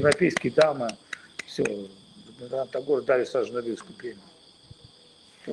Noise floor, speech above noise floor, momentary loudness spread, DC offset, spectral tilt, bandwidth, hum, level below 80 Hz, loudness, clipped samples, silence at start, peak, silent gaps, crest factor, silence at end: -55 dBFS; 29 dB; 18 LU; under 0.1%; -5 dB/octave; 12 kHz; none; -66 dBFS; -27 LUFS; under 0.1%; 0 s; -4 dBFS; none; 24 dB; 0 s